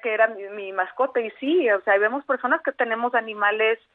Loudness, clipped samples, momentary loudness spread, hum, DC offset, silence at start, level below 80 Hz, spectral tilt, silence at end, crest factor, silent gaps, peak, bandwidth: -22 LUFS; under 0.1%; 7 LU; none; under 0.1%; 0.05 s; -80 dBFS; -6.5 dB/octave; 0.2 s; 16 dB; none; -6 dBFS; 4.1 kHz